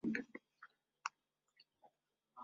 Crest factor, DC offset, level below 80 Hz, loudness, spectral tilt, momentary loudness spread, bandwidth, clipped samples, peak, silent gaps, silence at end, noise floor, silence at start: 30 dB; under 0.1%; -86 dBFS; -48 LUFS; -4 dB/octave; 23 LU; 7.4 kHz; under 0.1%; -20 dBFS; none; 0 s; -83 dBFS; 0.05 s